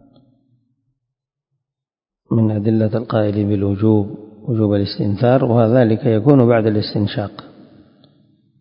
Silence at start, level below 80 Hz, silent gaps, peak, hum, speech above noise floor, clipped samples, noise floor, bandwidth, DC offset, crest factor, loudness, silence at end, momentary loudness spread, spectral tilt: 2.3 s; -46 dBFS; none; 0 dBFS; none; 72 dB; under 0.1%; -87 dBFS; 5.4 kHz; under 0.1%; 18 dB; -16 LUFS; 1.15 s; 9 LU; -11.5 dB/octave